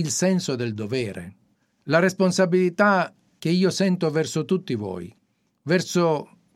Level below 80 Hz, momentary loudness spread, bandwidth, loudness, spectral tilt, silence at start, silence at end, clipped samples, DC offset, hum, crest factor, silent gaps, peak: -68 dBFS; 14 LU; 14 kHz; -23 LUFS; -5 dB/octave; 0 s; 0.3 s; under 0.1%; under 0.1%; none; 18 dB; none; -4 dBFS